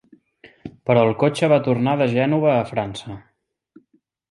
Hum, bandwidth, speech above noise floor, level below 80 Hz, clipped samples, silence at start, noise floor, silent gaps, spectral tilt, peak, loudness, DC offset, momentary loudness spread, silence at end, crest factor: none; 11.5 kHz; 45 dB; -58 dBFS; under 0.1%; 0.45 s; -64 dBFS; none; -7 dB/octave; -2 dBFS; -19 LUFS; under 0.1%; 21 LU; 1.1 s; 18 dB